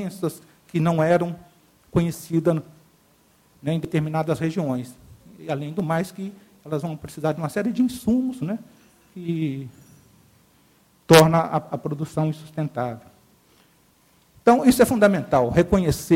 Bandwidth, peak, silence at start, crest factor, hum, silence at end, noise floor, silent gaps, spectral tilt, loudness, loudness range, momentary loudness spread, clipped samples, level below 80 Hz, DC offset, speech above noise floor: 16.5 kHz; 0 dBFS; 0 s; 22 dB; none; 0 s; -59 dBFS; none; -6 dB/octave; -22 LUFS; 6 LU; 16 LU; under 0.1%; -48 dBFS; under 0.1%; 38 dB